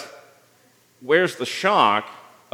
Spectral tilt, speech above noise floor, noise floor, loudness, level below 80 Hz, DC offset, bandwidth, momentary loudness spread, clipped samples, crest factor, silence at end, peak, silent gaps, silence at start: -4 dB/octave; 38 dB; -58 dBFS; -20 LUFS; -82 dBFS; under 0.1%; 17 kHz; 23 LU; under 0.1%; 20 dB; 0.4 s; -2 dBFS; none; 0 s